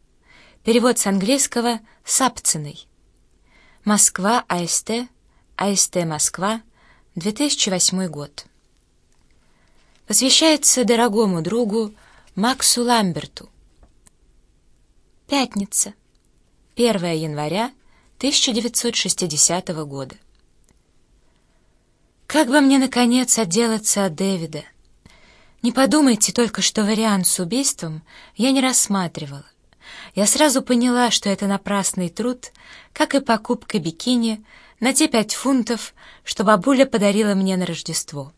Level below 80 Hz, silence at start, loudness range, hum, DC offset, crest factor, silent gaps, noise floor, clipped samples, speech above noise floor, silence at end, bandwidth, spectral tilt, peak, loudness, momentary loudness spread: -56 dBFS; 0.65 s; 5 LU; none; under 0.1%; 20 dB; none; -60 dBFS; under 0.1%; 41 dB; 0.1 s; 11 kHz; -3 dB/octave; 0 dBFS; -18 LUFS; 15 LU